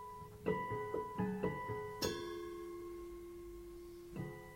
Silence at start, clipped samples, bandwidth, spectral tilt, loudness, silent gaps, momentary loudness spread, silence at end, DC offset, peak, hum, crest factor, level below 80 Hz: 0 s; under 0.1%; 16 kHz; -5.5 dB/octave; -44 LUFS; none; 12 LU; 0 s; under 0.1%; -24 dBFS; none; 20 dB; -62 dBFS